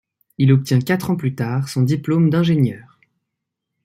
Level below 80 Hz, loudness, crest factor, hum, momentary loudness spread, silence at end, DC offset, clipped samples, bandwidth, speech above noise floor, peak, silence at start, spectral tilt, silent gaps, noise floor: -58 dBFS; -18 LUFS; 16 dB; none; 6 LU; 1.05 s; under 0.1%; under 0.1%; 15.5 kHz; 63 dB; -4 dBFS; 0.4 s; -7.5 dB/octave; none; -80 dBFS